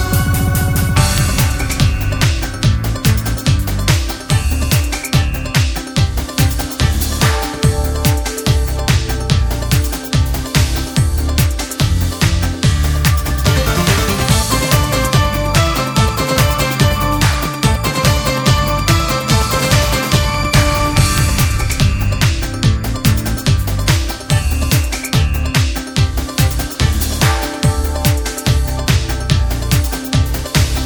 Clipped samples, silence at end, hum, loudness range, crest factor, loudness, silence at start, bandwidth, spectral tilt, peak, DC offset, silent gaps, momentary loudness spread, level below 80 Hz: under 0.1%; 0 s; none; 2 LU; 14 dB; -15 LUFS; 0 s; over 20 kHz; -4.5 dB/octave; 0 dBFS; under 0.1%; none; 3 LU; -20 dBFS